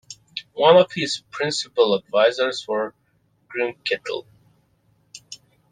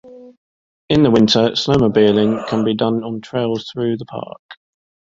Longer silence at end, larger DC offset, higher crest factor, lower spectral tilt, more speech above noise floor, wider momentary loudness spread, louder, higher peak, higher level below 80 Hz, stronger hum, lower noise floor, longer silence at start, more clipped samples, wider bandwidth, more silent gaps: second, 0.35 s vs 0.6 s; neither; about the same, 20 dB vs 16 dB; second, -3.5 dB/octave vs -6 dB/octave; second, 43 dB vs over 74 dB; first, 19 LU vs 12 LU; second, -21 LUFS vs -16 LUFS; about the same, -2 dBFS vs -2 dBFS; second, -68 dBFS vs -48 dBFS; neither; second, -63 dBFS vs under -90 dBFS; about the same, 0.1 s vs 0.05 s; neither; first, 9.8 kHz vs 7.6 kHz; second, none vs 0.37-0.88 s, 4.39-4.49 s